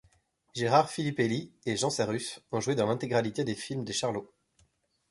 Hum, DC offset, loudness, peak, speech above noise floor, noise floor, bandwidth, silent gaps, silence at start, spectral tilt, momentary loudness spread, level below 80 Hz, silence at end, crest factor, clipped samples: none; under 0.1%; -30 LUFS; -10 dBFS; 40 dB; -70 dBFS; 11.5 kHz; none; 0.55 s; -4.5 dB/octave; 9 LU; -66 dBFS; 0.85 s; 22 dB; under 0.1%